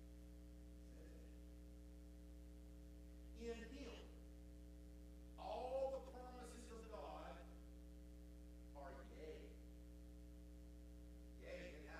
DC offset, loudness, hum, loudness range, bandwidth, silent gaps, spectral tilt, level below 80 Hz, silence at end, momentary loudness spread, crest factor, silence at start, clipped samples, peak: under 0.1%; -57 LUFS; 60 Hz at -60 dBFS; 7 LU; 15 kHz; none; -6 dB/octave; -60 dBFS; 0 s; 10 LU; 20 dB; 0 s; under 0.1%; -36 dBFS